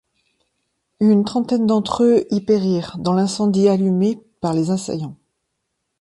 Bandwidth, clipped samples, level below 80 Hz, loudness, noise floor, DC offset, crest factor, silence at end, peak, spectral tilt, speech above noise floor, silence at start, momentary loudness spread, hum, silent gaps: 11.5 kHz; under 0.1%; -56 dBFS; -18 LUFS; -75 dBFS; under 0.1%; 16 dB; 0.85 s; -4 dBFS; -7 dB/octave; 58 dB; 1 s; 7 LU; none; none